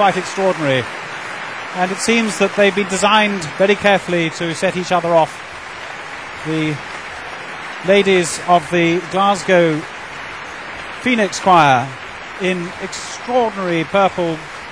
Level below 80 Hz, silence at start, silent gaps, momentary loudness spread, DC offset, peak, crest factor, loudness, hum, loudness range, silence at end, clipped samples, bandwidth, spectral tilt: -52 dBFS; 0 s; none; 15 LU; 0.2%; 0 dBFS; 16 dB; -16 LUFS; none; 4 LU; 0 s; under 0.1%; 13.5 kHz; -4.5 dB/octave